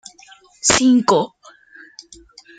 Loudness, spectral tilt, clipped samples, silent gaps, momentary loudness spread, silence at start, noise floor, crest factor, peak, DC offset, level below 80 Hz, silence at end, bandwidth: -16 LUFS; -2.5 dB/octave; under 0.1%; none; 8 LU; 0.65 s; -48 dBFS; 20 dB; 0 dBFS; under 0.1%; -50 dBFS; 1.3 s; 9.4 kHz